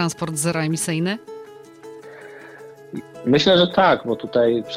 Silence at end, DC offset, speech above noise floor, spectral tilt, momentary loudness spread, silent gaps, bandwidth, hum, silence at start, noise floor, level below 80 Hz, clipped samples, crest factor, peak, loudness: 0 s; under 0.1%; 22 dB; -4.5 dB/octave; 24 LU; none; 16 kHz; none; 0 s; -41 dBFS; -56 dBFS; under 0.1%; 16 dB; -4 dBFS; -19 LUFS